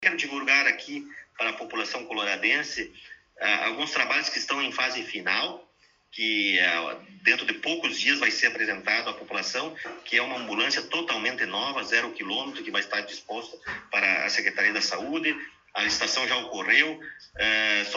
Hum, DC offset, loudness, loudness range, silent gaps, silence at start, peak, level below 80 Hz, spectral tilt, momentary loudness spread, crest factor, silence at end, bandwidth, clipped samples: none; under 0.1%; -25 LUFS; 3 LU; none; 0 s; -4 dBFS; -66 dBFS; -1 dB/octave; 14 LU; 22 dB; 0 s; 8 kHz; under 0.1%